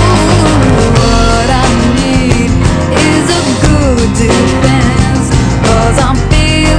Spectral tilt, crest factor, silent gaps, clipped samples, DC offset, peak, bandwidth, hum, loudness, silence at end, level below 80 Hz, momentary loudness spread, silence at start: -5.5 dB/octave; 8 dB; none; 0.3%; under 0.1%; 0 dBFS; 11 kHz; none; -9 LUFS; 0 s; -16 dBFS; 2 LU; 0 s